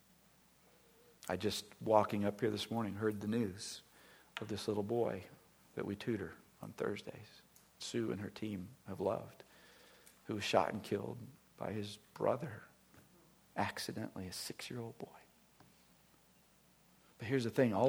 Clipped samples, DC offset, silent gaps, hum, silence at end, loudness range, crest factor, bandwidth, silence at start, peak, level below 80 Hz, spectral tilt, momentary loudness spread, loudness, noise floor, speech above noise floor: under 0.1%; under 0.1%; none; none; 0 s; 8 LU; 26 dB; over 20 kHz; 1.25 s; -14 dBFS; -76 dBFS; -5.5 dB/octave; 20 LU; -40 LUFS; -69 dBFS; 30 dB